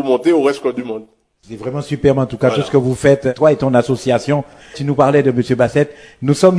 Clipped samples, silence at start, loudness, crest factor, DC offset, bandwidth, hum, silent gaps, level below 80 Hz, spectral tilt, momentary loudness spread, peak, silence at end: under 0.1%; 0 s; -15 LUFS; 14 dB; under 0.1%; 11 kHz; none; none; -46 dBFS; -7 dB/octave; 12 LU; 0 dBFS; 0 s